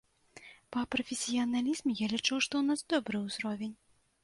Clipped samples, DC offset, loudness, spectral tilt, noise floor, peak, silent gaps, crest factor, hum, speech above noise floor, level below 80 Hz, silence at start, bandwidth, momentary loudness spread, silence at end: under 0.1%; under 0.1%; -33 LUFS; -3 dB/octave; -56 dBFS; -16 dBFS; none; 18 dB; none; 23 dB; -68 dBFS; 0.35 s; 11.5 kHz; 10 LU; 0.5 s